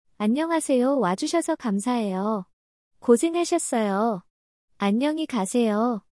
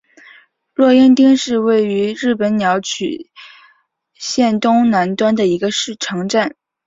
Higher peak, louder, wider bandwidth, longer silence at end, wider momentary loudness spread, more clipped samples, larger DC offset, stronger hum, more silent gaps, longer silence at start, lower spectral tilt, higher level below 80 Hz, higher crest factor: second, -6 dBFS vs -2 dBFS; second, -24 LUFS vs -15 LUFS; first, 12 kHz vs 7.8 kHz; second, 0.15 s vs 0.35 s; second, 6 LU vs 12 LU; neither; neither; neither; first, 2.53-2.91 s, 4.30-4.68 s vs none; second, 0.2 s vs 0.8 s; about the same, -5 dB/octave vs -4.5 dB/octave; second, -70 dBFS vs -58 dBFS; about the same, 18 dB vs 14 dB